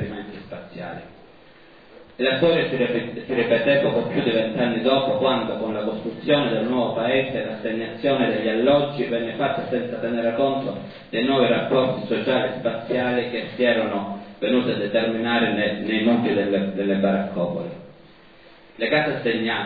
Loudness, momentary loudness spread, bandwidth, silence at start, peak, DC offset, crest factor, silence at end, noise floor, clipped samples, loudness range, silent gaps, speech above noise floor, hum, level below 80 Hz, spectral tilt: -22 LUFS; 10 LU; 5 kHz; 0 s; -6 dBFS; 0.2%; 18 dB; 0 s; -49 dBFS; under 0.1%; 2 LU; none; 28 dB; none; -62 dBFS; -9 dB/octave